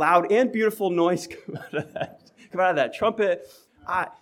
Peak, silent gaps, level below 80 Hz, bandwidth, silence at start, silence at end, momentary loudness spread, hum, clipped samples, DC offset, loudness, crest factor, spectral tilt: -6 dBFS; none; -66 dBFS; 18 kHz; 0 s; 0.1 s; 14 LU; none; under 0.1%; under 0.1%; -24 LUFS; 18 dB; -5.5 dB/octave